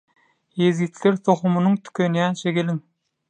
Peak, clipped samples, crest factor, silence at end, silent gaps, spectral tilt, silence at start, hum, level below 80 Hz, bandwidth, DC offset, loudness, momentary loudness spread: -4 dBFS; under 0.1%; 18 dB; 0.5 s; none; -7 dB/octave; 0.55 s; none; -70 dBFS; 9.4 kHz; under 0.1%; -21 LUFS; 6 LU